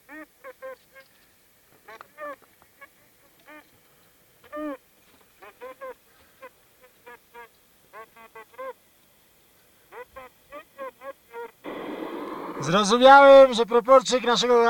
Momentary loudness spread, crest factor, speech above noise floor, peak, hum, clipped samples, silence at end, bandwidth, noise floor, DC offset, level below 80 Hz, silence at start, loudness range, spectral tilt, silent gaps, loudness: 30 LU; 22 dB; 44 dB; -2 dBFS; none; under 0.1%; 0 s; 18 kHz; -59 dBFS; under 0.1%; -60 dBFS; 0.15 s; 28 LU; -3.5 dB/octave; none; -17 LUFS